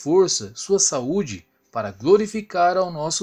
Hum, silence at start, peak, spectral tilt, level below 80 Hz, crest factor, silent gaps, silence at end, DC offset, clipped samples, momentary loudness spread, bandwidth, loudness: none; 0 s; -4 dBFS; -3.5 dB/octave; -58 dBFS; 16 dB; none; 0 s; under 0.1%; under 0.1%; 12 LU; 12 kHz; -20 LUFS